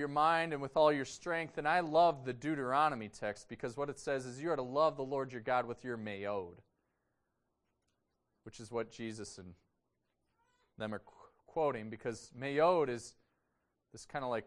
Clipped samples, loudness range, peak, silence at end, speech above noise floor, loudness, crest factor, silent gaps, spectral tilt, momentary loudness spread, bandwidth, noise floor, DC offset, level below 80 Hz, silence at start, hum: under 0.1%; 15 LU; -16 dBFS; 0 s; 48 dB; -36 LUFS; 20 dB; none; -5 dB/octave; 15 LU; 11.5 kHz; -84 dBFS; under 0.1%; -70 dBFS; 0 s; none